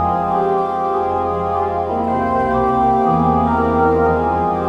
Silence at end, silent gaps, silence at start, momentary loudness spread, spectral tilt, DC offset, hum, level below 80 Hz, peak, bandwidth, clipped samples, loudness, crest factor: 0 s; none; 0 s; 4 LU; -9 dB/octave; under 0.1%; none; -36 dBFS; -4 dBFS; 8.2 kHz; under 0.1%; -16 LUFS; 12 dB